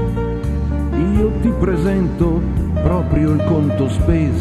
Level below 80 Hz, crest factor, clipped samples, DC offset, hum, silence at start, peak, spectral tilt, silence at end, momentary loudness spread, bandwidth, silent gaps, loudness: -22 dBFS; 14 dB; under 0.1%; under 0.1%; none; 0 s; -2 dBFS; -9 dB/octave; 0 s; 5 LU; 12 kHz; none; -17 LUFS